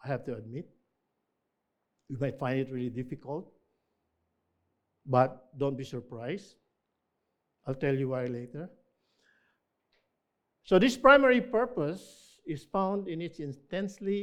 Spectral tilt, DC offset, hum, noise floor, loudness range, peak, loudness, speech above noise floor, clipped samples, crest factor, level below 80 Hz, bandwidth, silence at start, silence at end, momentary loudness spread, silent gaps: -6.5 dB/octave; under 0.1%; none; -82 dBFS; 11 LU; -6 dBFS; -29 LUFS; 53 dB; under 0.1%; 26 dB; -62 dBFS; 13 kHz; 0.05 s; 0 s; 20 LU; none